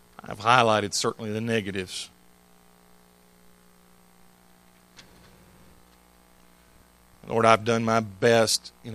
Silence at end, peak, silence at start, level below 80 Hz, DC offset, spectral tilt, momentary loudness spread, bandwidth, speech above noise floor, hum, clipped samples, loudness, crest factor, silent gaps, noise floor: 0 s; 0 dBFS; 0.3 s; -64 dBFS; under 0.1%; -4 dB/octave; 13 LU; 15.5 kHz; 34 dB; 60 Hz at -60 dBFS; under 0.1%; -23 LUFS; 28 dB; none; -57 dBFS